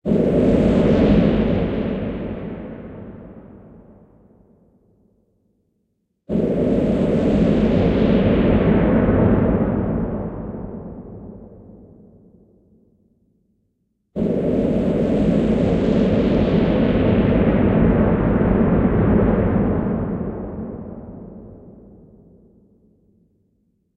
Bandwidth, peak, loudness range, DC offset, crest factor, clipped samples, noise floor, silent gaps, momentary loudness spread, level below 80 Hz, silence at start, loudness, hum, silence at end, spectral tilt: 7.6 kHz; -2 dBFS; 17 LU; under 0.1%; 16 dB; under 0.1%; -70 dBFS; none; 18 LU; -32 dBFS; 0.05 s; -18 LUFS; none; 2.25 s; -9.5 dB/octave